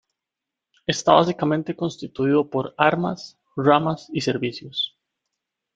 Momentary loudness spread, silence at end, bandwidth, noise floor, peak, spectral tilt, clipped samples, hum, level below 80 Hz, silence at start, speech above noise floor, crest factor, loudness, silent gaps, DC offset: 11 LU; 0.9 s; 9.2 kHz; -86 dBFS; 0 dBFS; -5.5 dB/octave; under 0.1%; none; -62 dBFS; 0.9 s; 64 dB; 22 dB; -22 LUFS; none; under 0.1%